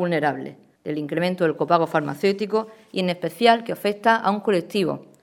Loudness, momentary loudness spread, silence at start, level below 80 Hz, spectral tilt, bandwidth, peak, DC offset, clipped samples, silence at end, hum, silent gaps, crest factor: -22 LUFS; 11 LU; 0 s; -70 dBFS; -6 dB/octave; 18 kHz; -2 dBFS; under 0.1%; under 0.1%; 0.2 s; none; none; 22 dB